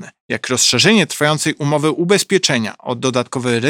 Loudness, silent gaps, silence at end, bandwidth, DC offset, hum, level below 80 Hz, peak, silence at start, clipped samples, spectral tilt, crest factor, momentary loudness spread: -15 LUFS; 0.20-0.29 s; 0 s; 18 kHz; under 0.1%; none; -62 dBFS; 0 dBFS; 0 s; under 0.1%; -3.5 dB/octave; 16 dB; 9 LU